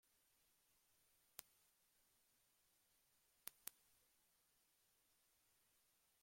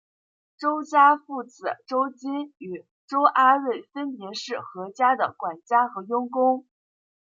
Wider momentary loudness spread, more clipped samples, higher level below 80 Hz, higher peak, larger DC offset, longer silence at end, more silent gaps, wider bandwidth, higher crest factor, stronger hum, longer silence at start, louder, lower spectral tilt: second, 5 LU vs 16 LU; neither; about the same, under -90 dBFS vs -86 dBFS; second, -24 dBFS vs -6 dBFS; neither; second, 0 s vs 0.75 s; second, none vs 2.91-3.08 s; first, 16.5 kHz vs 7.6 kHz; first, 46 dB vs 20 dB; neither; second, 0.05 s vs 0.6 s; second, -59 LUFS vs -24 LUFS; second, 0.5 dB/octave vs -4.5 dB/octave